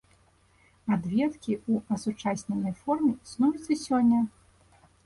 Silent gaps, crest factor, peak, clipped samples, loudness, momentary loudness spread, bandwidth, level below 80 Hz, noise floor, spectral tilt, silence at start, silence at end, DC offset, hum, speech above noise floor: none; 14 dB; -14 dBFS; under 0.1%; -28 LUFS; 8 LU; 11.5 kHz; -62 dBFS; -63 dBFS; -6.5 dB/octave; 0.85 s; 0.75 s; under 0.1%; none; 36 dB